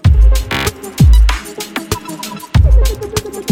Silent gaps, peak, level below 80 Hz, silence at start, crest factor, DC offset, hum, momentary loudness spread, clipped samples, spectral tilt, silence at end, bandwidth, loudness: none; 0 dBFS; -12 dBFS; 0.05 s; 12 dB; under 0.1%; none; 13 LU; under 0.1%; -5.5 dB/octave; 0 s; 16 kHz; -14 LUFS